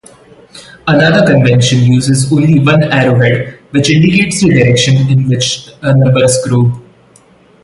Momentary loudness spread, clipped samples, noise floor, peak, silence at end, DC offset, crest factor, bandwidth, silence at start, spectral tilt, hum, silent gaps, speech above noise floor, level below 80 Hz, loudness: 7 LU; under 0.1%; -44 dBFS; 0 dBFS; 0.85 s; under 0.1%; 10 dB; 11.5 kHz; 0.55 s; -5.5 dB/octave; none; none; 35 dB; -40 dBFS; -9 LUFS